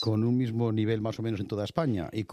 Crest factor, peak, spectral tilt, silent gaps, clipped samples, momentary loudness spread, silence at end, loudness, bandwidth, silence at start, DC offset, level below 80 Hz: 18 dB; -10 dBFS; -8 dB/octave; none; under 0.1%; 6 LU; 0 s; -29 LUFS; 10 kHz; 0 s; under 0.1%; -60 dBFS